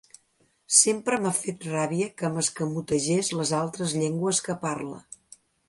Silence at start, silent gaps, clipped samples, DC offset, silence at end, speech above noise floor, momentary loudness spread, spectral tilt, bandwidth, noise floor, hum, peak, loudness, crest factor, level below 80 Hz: 0.7 s; none; under 0.1%; under 0.1%; 0.7 s; 41 dB; 13 LU; -3.5 dB/octave; 11.5 kHz; -67 dBFS; none; -4 dBFS; -25 LUFS; 24 dB; -66 dBFS